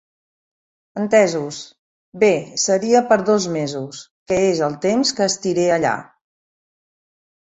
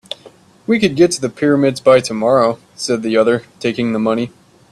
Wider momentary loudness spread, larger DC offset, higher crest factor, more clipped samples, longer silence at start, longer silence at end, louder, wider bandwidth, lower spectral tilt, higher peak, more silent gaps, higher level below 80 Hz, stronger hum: first, 14 LU vs 11 LU; neither; about the same, 18 dB vs 16 dB; neither; first, 0.95 s vs 0.25 s; first, 1.55 s vs 0.4 s; second, -18 LUFS vs -15 LUFS; second, 8.4 kHz vs 12.5 kHz; about the same, -4 dB/octave vs -5 dB/octave; about the same, -2 dBFS vs 0 dBFS; first, 1.79-2.12 s, 4.11-4.26 s vs none; second, -60 dBFS vs -54 dBFS; neither